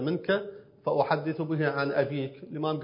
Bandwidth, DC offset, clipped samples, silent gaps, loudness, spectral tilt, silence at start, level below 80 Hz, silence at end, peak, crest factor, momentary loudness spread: 5.4 kHz; under 0.1%; under 0.1%; none; -29 LUFS; -10.5 dB/octave; 0 s; -72 dBFS; 0 s; -10 dBFS; 20 dB; 9 LU